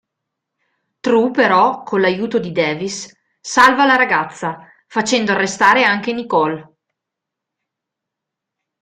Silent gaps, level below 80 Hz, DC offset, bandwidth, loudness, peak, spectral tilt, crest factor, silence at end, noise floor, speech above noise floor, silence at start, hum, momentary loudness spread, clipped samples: none; -60 dBFS; under 0.1%; 15 kHz; -15 LUFS; 0 dBFS; -3.5 dB/octave; 18 dB; 2.2 s; -82 dBFS; 67 dB; 1.05 s; none; 14 LU; under 0.1%